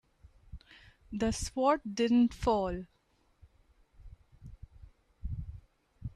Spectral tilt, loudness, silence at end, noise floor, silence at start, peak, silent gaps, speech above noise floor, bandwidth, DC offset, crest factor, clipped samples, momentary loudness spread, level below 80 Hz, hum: -5.5 dB/octave; -31 LUFS; 0.05 s; -71 dBFS; 0.55 s; -14 dBFS; none; 41 dB; 12 kHz; under 0.1%; 20 dB; under 0.1%; 26 LU; -50 dBFS; none